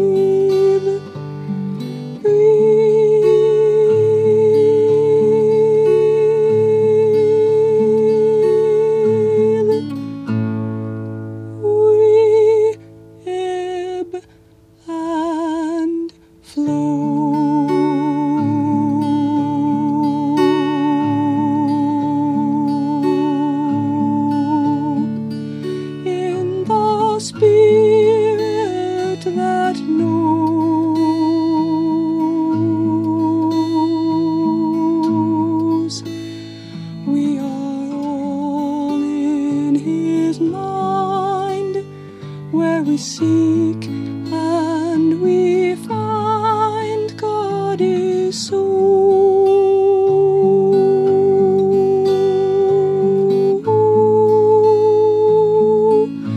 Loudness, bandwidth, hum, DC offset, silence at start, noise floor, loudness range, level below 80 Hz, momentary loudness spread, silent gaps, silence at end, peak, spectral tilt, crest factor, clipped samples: -16 LUFS; 10.5 kHz; none; under 0.1%; 0 s; -48 dBFS; 6 LU; -60 dBFS; 11 LU; none; 0 s; -4 dBFS; -7.5 dB/octave; 12 dB; under 0.1%